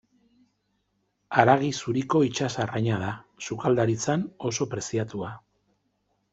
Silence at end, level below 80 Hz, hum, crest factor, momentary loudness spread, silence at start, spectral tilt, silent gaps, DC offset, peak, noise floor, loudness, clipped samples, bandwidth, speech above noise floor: 0.95 s; -64 dBFS; 50 Hz at -60 dBFS; 24 dB; 13 LU; 1.3 s; -5.5 dB/octave; none; under 0.1%; -4 dBFS; -74 dBFS; -26 LUFS; under 0.1%; 8.2 kHz; 49 dB